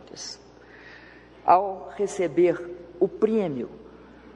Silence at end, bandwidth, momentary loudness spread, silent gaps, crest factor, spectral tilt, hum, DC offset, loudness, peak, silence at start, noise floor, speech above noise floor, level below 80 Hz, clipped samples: 0.05 s; 11.5 kHz; 24 LU; none; 22 dB; -5.5 dB/octave; none; under 0.1%; -25 LUFS; -4 dBFS; 0.15 s; -49 dBFS; 24 dB; -60 dBFS; under 0.1%